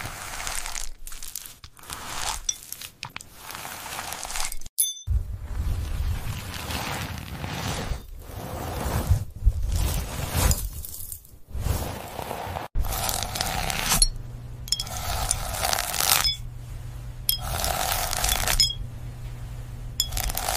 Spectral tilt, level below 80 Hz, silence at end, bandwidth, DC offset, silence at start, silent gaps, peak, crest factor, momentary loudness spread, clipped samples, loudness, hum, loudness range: -2.5 dB/octave; -32 dBFS; 0 s; 16 kHz; under 0.1%; 0 s; 4.69-4.77 s; 0 dBFS; 28 dB; 16 LU; under 0.1%; -27 LUFS; none; 8 LU